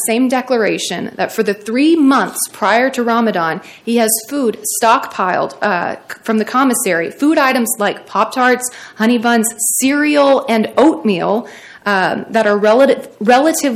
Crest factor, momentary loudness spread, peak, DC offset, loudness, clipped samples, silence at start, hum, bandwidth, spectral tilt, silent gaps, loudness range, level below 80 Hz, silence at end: 14 dB; 7 LU; 0 dBFS; under 0.1%; -14 LUFS; under 0.1%; 0 s; none; 16.5 kHz; -3.5 dB/octave; none; 2 LU; -62 dBFS; 0 s